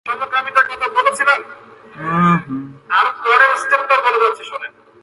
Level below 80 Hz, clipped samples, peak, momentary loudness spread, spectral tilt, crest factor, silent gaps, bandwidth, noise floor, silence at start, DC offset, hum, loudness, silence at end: -60 dBFS; under 0.1%; 0 dBFS; 16 LU; -5 dB/octave; 16 dB; none; 11.5 kHz; -39 dBFS; 0.05 s; under 0.1%; none; -15 LUFS; 0.35 s